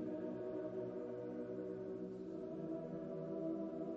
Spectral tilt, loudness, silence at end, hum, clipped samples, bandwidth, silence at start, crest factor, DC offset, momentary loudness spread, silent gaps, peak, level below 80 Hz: -9.5 dB/octave; -46 LUFS; 0 s; none; under 0.1%; 7.2 kHz; 0 s; 12 dB; under 0.1%; 4 LU; none; -32 dBFS; -76 dBFS